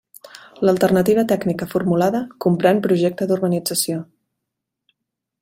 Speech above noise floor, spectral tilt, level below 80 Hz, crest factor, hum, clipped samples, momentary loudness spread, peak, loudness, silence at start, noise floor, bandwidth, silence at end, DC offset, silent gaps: 63 dB; -5.5 dB/octave; -58 dBFS; 18 dB; none; under 0.1%; 6 LU; -2 dBFS; -19 LUFS; 0.35 s; -80 dBFS; 16.5 kHz; 1.4 s; under 0.1%; none